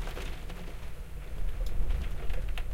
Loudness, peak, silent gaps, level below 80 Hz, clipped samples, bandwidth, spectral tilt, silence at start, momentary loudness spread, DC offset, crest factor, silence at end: -40 LUFS; -16 dBFS; none; -34 dBFS; under 0.1%; 15 kHz; -5.5 dB/octave; 0 s; 9 LU; under 0.1%; 14 dB; 0 s